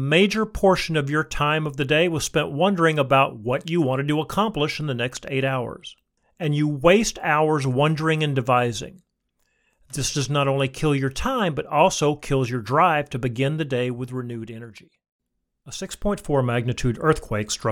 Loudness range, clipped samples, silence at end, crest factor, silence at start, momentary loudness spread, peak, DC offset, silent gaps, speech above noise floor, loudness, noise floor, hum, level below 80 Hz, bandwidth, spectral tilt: 5 LU; under 0.1%; 0 s; 20 dB; 0 s; 11 LU; -4 dBFS; under 0.1%; 15.12-15.19 s; 50 dB; -22 LUFS; -72 dBFS; none; -44 dBFS; 17 kHz; -5 dB/octave